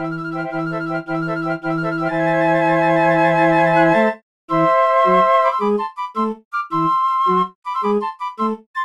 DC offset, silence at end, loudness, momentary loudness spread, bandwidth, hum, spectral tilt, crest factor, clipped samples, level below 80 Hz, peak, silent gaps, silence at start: under 0.1%; 0 s; -18 LUFS; 10 LU; 11 kHz; none; -7.5 dB/octave; 14 dB; under 0.1%; -58 dBFS; -2 dBFS; 4.23-4.48 s, 6.45-6.51 s, 7.55-7.62 s, 8.66-8.74 s; 0 s